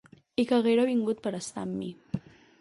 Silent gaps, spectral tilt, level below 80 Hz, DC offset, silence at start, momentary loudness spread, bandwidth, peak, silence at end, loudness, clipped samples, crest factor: none; -5.5 dB/octave; -64 dBFS; under 0.1%; 0.4 s; 14 LU; 11.5 kHz; -14 dBFS; 0.4 s; -29 LUFS; under 0.1%; 16 dB